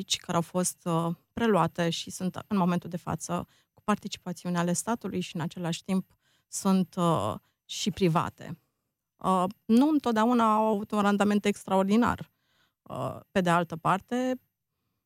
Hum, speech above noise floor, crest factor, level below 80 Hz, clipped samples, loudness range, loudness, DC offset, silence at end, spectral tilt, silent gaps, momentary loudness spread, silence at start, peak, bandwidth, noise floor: none; 55 dB; 18 dB; -62 dBFS; under 0.1%; 6 LU; -28 LUFS; under 0.1%; 0.7 s; -5.5 dB/octave; none; 12 LU; 0 s; -10 dBFS; 16 kHz; -83 dBFS